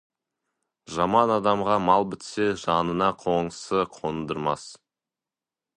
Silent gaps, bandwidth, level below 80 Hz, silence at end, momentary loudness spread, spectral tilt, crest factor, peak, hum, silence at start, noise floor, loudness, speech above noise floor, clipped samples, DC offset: none; 11 kHz; -56 dBFS; 1 s; 10 LU; -5.5 dB/octave; 22 dB; -4 dBFS; none; 0.9 s; under -90 dBFS; -25 LUFS; over 66 dB; under 0.1%; under 0.1%